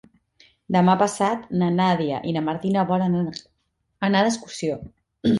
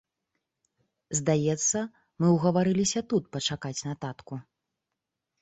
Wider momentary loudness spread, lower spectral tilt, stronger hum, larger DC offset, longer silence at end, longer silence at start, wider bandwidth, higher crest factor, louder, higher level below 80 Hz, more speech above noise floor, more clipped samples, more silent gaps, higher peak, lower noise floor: second, 9 LU vs 14 LU; about the same, -6 dB/octave vs -5 dB/octave; neither; neither; second, 0 s vs 1 s; second, 0.7 s vs 1.1 s; first, 11.5 kHz vs 8.2 kHz; about the same, 18 dB vs 18 dB; first, -22 LUFS vs -27 LUFS; about the same, -58 dBFS vs -62 dBFS; second, 40 dB vs 59 dB; neither; neither; first, -6 dBFS vs -10 dBFS; second, -62 dBFS vs -86 dBFS